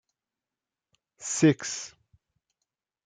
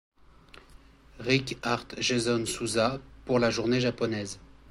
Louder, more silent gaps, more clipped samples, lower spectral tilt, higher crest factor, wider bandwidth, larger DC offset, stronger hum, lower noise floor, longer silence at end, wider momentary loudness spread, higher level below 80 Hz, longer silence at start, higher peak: about the same, -26 LUFS vs -28 LUFS; neither; neither; about the same, -4.5 dB/octave vs -4.5 dB/octave; about the same, 22 dB vs 20 dB; second, 9.6 kHz vs 14.5 kHz; neither; neither; first, under -90 dBFS vs -54 dBFS; first, 1.15 s vs 0 s; first, 17 LU vs 11 LU; second, -76 dBFS vs -54 dBFS; first, 1.2 s vs 0.55 s; about the same, -10 dBFS vs -10 dBFS